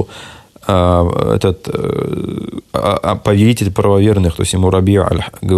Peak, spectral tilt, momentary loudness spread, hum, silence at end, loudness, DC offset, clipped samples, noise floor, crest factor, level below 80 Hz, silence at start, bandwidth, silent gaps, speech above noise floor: 0 dBFS; -6.5 dB/octave; 10 LU; none; 0 s; -14 LUFS; under 0.1%; under 0.1%; -36 dBFS; 14 dB; -36 dBFS; 0 s; 13.5 kHz; none; 23 dB